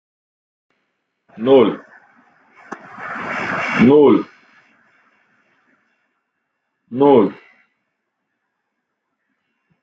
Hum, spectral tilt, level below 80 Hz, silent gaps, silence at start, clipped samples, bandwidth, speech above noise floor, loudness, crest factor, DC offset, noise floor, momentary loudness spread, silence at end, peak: none; -7.5 dB/octave; -60 dBFS; none; 1.35 s; under 0.1%; 7.6 kHz; 63 dB; -15 LUFS; 18 dB; under 0.1%; -75 dBFS; 23 LU; 2.5 s; -2 dBFS